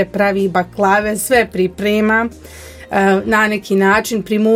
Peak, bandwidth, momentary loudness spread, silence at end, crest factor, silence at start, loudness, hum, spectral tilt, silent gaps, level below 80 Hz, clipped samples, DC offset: 0 dBFS; 16.5 kHz; 7 LU; 0 s; 14 dB; 0 s; -15 LUFS; none; -5 dB/octave; none; -42 dBFS; under 0.1%; under 0.1%